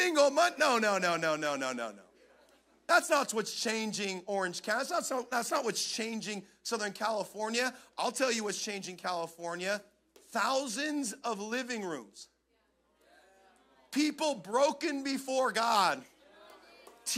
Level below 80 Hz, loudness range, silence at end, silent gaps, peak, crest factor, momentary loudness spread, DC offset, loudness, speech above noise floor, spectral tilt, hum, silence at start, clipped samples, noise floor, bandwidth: -82 dBFS; 5 LU; 0 s; none; -14 dBFS; 20 dB; 11 LU; under 0.1%; -32 LUFS; 42 dB; -2.5 dB/octave; none; 0 s; under 0.1%; -74 dBFS; 16 kHz